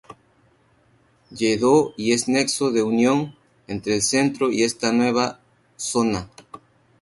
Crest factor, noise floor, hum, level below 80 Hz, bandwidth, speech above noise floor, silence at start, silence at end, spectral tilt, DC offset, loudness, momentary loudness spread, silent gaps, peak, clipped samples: 18 dB; -60 dBFS; none; -56 dBFS; 11.5 kHz; 39 dB; 0.1 s; 0.45 s; -4 dB/octave; under 0.1%; -21 LUFS; 12 LU; none; -4 dBFS; under 0.1%